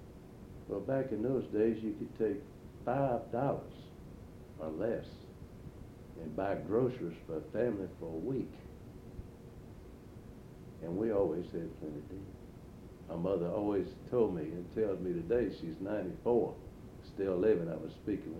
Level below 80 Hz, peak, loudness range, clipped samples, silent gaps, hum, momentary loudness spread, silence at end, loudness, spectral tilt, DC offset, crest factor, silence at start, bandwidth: -58 dBFS; -18 dBFS; 6 LU; under 0.1%; none; none; 20 LU; 0 s; -36 LUFS; -9 dB/octave; under 0.1%; 20 dB; 0 s; 16 kHz